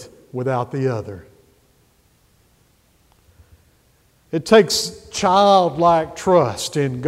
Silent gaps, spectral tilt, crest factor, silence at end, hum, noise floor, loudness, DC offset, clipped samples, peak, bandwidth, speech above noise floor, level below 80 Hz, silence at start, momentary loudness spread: none; -4.5 dB/octave; 20 dB; 0 s; none; -58 dBFS; -17 LUFS; under 0.1%; under 0.1%; 0 dBFS; 16 kHz; 41 dB; -54 dBFS; 0 s; 14 LU